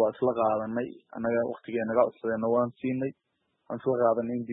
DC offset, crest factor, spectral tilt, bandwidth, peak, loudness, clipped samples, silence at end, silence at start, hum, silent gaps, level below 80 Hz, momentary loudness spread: under 0.1%; 18 dB; -11.5 dB/octave; 3.9 kHz; -10 dBFS; -29 LUFS; under 0.1%; 0 s; 0 s; none; none; -70 dBFS; 8 LU